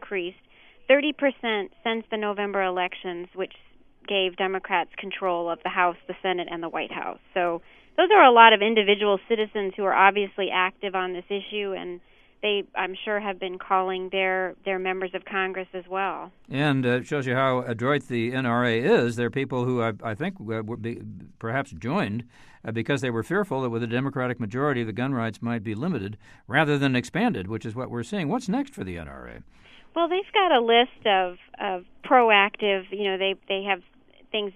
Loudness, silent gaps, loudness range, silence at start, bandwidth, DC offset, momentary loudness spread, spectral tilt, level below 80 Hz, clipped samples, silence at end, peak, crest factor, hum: -24 LUFS; none; 9 LU; 0 s; 12 kHz; under 0.1%; 14 LU; -6 dB/octave; -60 dBFS; under 0.1%; 0.05 s; 0 dBFS; 24 dB; none